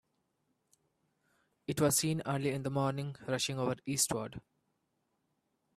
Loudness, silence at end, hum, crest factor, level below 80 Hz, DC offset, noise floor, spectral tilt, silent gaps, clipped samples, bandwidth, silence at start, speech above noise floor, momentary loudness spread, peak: -33 LUFS; 1.35 s; none; 22 dB; -68 dBFS; under 0.1%; -81 dBFS; -4 dB/octave; none; under 0.1%; 15.5 kHz; 1.7 s; 47 dB; 11 LU; -16 dBFS